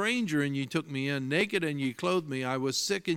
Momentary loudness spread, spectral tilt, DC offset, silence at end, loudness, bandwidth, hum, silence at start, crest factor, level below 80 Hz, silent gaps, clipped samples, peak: 4 LU; -4.5 dB/octave; under 0.1%; 0 s; -30 LUFS; 17 kHz; none; 0 s; 16 dB; -72 dBFS; none; under 0.1%; -14 dBFS